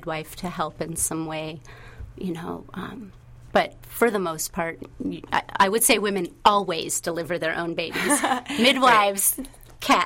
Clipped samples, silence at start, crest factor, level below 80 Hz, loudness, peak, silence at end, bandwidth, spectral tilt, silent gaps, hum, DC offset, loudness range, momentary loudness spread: under 0.1%; 0 s; 20 dB; -50 dBFS; -23 LUFS; -4 dBFS; 0 s; 16.5 kHz; -2.5 dB/octave; none; none; under 0.1%; 8 LU; 17 LU